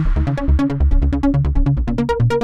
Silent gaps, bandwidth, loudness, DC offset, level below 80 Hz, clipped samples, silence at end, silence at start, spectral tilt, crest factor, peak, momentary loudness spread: none; 8 kHz; -18 LUFS; under 0.1%; -18 dBFS; under 0.1%; 0 s; 0 s; -9 dB/octave; 10 dB; -6 dBFS; 2 LU